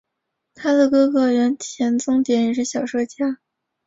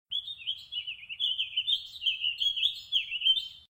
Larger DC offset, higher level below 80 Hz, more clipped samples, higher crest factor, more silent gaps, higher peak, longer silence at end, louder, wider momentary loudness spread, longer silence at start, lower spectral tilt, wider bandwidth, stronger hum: neither; first, -64 dBFS vs -70 dBFS; neither; about the same, 14 dB vs 18 dB; neither; first, -6 dBFS vs -14 dBFS; first, 0.5 s vs 0.1 s; first, -19 LUFS vs -29 LUFS; about the same, 9 LU vs 10 LU; first, 0.6 s vs 0.1 s; first, -4 dB/octave vs 2.5 dB/octave; second, 7.8 kHz vs 16 kHz; neither